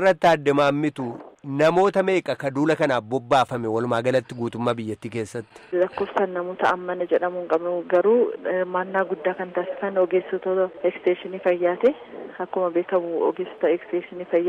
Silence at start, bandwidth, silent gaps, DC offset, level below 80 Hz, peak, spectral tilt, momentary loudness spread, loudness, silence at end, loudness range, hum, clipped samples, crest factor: 0 s; 12 kHz; none; under 0.1%; -64 dBFS; -8 dBFS; -6.5 dB/octave; 11 LU; -23 LUFS; 0 s; 3 LU; none; under 0.1%; 14 dB